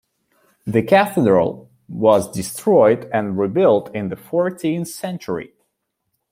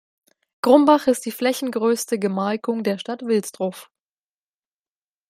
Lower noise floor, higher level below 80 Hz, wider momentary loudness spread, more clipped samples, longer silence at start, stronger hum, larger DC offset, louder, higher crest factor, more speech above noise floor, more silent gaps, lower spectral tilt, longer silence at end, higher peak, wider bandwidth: second, -74 dBFS vs under -90 dBFS; first, -58 dBFS vs -70 dBFS; about the same, 13 LU vs 12 LU; neither; about the same, 0.65 s vs 0.65 s; neither; neither; first, -18 LUFS vs -21 LUFS; about the same, 18 dB vs 20 dB; second, 56 dB vs over 70 dB; neither; about the same, -6 dB/octave vs -5 dB/octave; second, 0.85 s vs 1.45 s; about the same, -2 dBFS vs -2 dBFS; about the same, 16.5 kHz vs 16 kHz